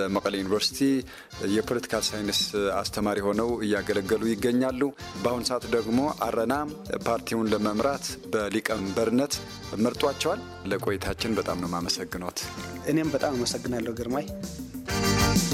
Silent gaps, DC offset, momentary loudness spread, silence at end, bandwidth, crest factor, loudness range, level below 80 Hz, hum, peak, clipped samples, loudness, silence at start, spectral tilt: none; under 0.1%; 7 LU; 0 s; 16.5 kHz; 18 dB; 2 LU; -46 dBFS; none; -10 dBFS; under 0.1%; -27 LUFS; 0 s; -4.5 dB/octave